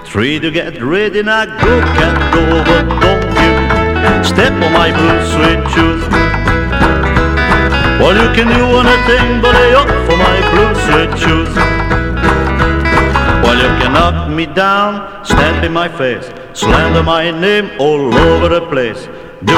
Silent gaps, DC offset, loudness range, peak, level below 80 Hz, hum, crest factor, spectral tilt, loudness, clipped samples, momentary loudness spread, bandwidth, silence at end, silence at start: none; under 0.1%; 3 LU; 0 dBFS; -20 dBFS; none; 10 dB; -5.5 dB/octave; -10 LUFS; 0.2%; 6 LU; 15 kHz; 0 s; 0 s